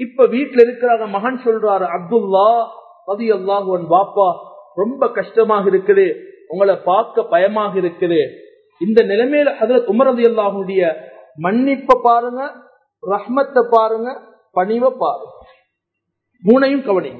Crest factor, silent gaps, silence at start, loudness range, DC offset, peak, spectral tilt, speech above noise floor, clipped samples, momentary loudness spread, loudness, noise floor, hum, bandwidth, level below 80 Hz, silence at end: 16 dB; none; 0 s; 3 LU; under 0.1%; 0 dBFS; -8.5 dB/octave; 62 dB; under 0.1%; 11 LU; -15 LUFS; -77 dBFS; none; 5.2 kHz; -62 dBFS; 0 s